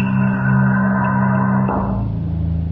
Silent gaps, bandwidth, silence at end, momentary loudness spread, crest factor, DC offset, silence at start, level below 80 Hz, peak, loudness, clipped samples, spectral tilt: none; 3.1 kHz; 0 s; 6 LU; 12 dB; under 0.1%; 0 s; -32 dBFS; -4 dBFS; -17 LUFS; under 0.1%; -12 dB/octave